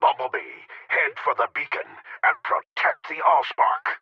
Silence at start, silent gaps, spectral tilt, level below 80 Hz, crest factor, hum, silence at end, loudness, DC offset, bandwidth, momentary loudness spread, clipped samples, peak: 0 s; 2.71-2.76 s; -3 dB/octave; -86 dBFS; 18 dB; none; 0.05 s; -23 LUFS; under 0.1%; 6.8 kHz; 11 LU; under 0.1%; -6 dBFS